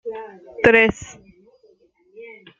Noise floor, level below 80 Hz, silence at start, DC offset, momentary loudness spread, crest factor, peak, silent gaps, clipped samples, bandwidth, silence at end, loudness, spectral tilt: -57 dBFS; -50 dBFS; 0.05 s; under 0.1%; 26 LU; 20 dB; -2 dBFS; none; under 0.1%; 7.6 kHz; 0.35 s; -16 LUFS; -5 dB/octave